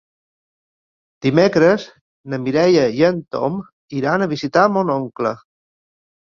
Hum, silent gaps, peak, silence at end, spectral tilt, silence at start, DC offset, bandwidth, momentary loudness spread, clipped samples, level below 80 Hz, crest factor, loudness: none; 2.01-2.24 s, 3.72-3.88 s; 0 dBFS; 0.95 s; -6.5 dB/octave; 1.2 s; under 0.1%; 7.2 kHz; 13 LU; under 0.1%; -58 dBFS; 18 dB; -17 LUFS